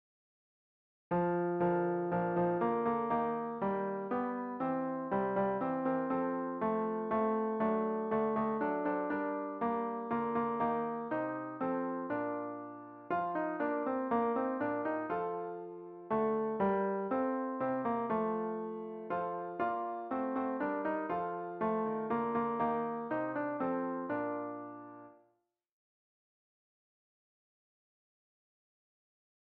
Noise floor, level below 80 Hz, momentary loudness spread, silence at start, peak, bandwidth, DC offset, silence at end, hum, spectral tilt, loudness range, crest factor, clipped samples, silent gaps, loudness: -78 dBFS; -72 dBFS; 6 LU; 1.1 s; -20 dBFS; 4.6 kHz; under 0.1%; 4.45 s; none; -7 dB/octave; 3 LU; 14 dB; under 0.1%; none; -35 LUFS